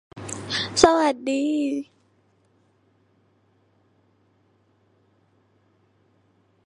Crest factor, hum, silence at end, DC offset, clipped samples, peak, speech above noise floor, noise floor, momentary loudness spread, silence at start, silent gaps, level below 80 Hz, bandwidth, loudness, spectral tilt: 28 dB; none; 4.85 s; under 0.1%; under 0.1%; 0 dBFS; 43 dB; -64 dBFS; 18 LU; 0.15 s; none; -56 dBFS; 11.5 kHz; -22 LUFS; -3.5 dB/octave